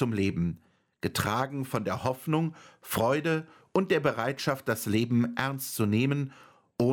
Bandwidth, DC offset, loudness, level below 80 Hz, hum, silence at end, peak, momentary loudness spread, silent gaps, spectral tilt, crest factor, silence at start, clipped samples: 17.5 kHz; under 0.1%; -29 LUFS; -60 dBFS; none; 0 s; -10 dBFS; 7 LU; none; -6 dB/octave; 18 dB; 0 s; under 0.1%